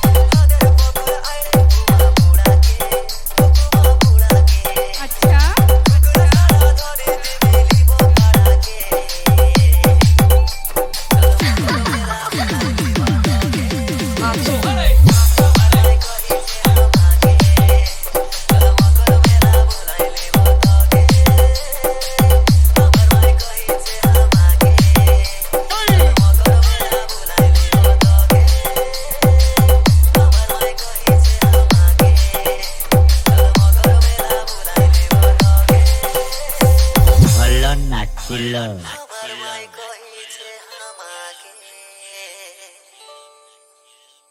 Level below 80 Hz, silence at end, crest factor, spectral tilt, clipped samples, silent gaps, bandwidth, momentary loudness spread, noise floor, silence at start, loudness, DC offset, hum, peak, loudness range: -14 dBFS; 1.8 s; 12 dB; -5.5 dB/octave; under 0.1%; none; 18 kHz; 10 LU; -53 dBFS; 0 s; -13 LUFS; under 0.1%; none; 0 dBFS; 4 LU